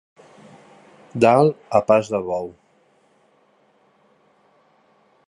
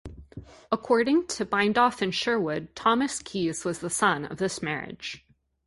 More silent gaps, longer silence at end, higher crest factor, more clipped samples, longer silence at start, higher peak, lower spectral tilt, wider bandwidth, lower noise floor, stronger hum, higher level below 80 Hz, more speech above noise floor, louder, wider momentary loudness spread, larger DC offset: neither; first, 2.8 s vs 0.5 s; about the same, 22 dB vs 20 dB; neither; first, 1.15 s vs 0.05 s; first, -2 dBFS vs -8 dBFS; first, -7 dB/octave vs -4 dB/octave; about the same, 11.5 kHz vs 11.5 kHz; first, -60 dBFS vs -46 dBFS; neither; second, -62 dBFS vs -56 dBFS; first, 42 dB vs 19 dB; first, -18 LUFS vs -26 LUFS; about the same, 16 LU vs 15 LU; neither